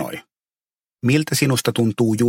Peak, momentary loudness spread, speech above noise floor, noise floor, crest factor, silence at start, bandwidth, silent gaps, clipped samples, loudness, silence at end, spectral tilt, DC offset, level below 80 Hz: -4 dBFS; 11 LU; over 72 dB; under -90 dBFS; 16 dB; 0 s; 17 kHz; none; under 0.1%; -19 LUFS; 0 s; -5 dB/octave; under 0.1%; -58 dBFS